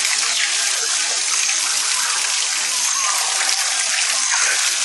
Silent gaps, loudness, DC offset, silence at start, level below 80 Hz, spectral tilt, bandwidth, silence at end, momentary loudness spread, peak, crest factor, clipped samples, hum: none; -16 LUFS; under 0.1%; 0 s; -74 dBFS; 5 dB/octave; 12.5 kHz; 0 s; 2 LU; -2 dBFS; 18 dB; under 0.1%; none